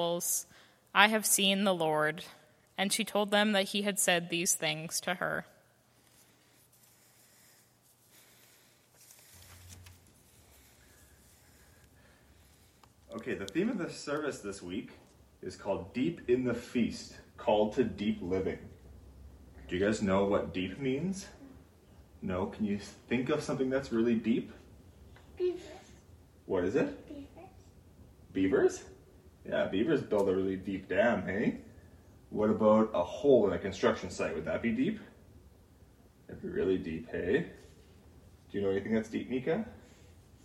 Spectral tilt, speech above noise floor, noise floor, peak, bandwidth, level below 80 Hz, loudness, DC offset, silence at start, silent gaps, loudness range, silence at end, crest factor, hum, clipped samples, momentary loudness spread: -4 dB/octave; 35 dB; -66 dBFS; -6 dBFS; 16.5 kHz; -60 dBFS; -32 LUFS; under 0.1%; 0 s; none; 8 LU; 0.65 s; 28 dB; none; under 0.1%; 18 LU